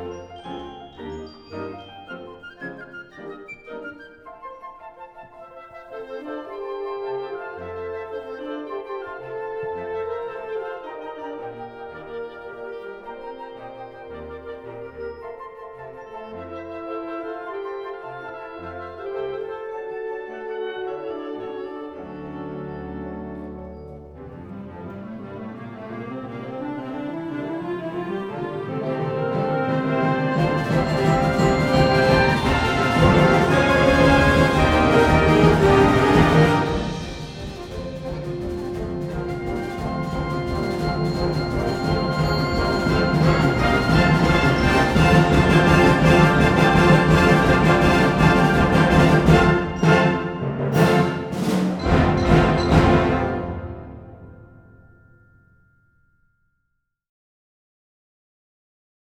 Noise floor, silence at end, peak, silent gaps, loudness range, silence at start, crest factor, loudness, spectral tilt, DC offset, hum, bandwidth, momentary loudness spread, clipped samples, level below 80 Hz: -74 dBFS; 4.55 s; -2 dBFS; none; 20 LU; 0 s; 20 dB; -19 LUFS; -6.5 dB/octave; under 0.1%; none; 15.5 kHz; 22 LU; under 0.1%; -34 dBFS